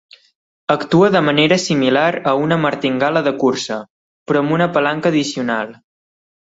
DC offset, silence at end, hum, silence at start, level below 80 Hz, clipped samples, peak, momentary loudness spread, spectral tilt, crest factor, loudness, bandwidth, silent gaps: under 0.1%; 0.75 s; none; 0.7 s; -58 dBFS; under 0.1%; 0 dBFS; 9 LU; -5.5 dB/octave; 16 dB; -16 LUFS; 8 kHz; 3.90-4.26 s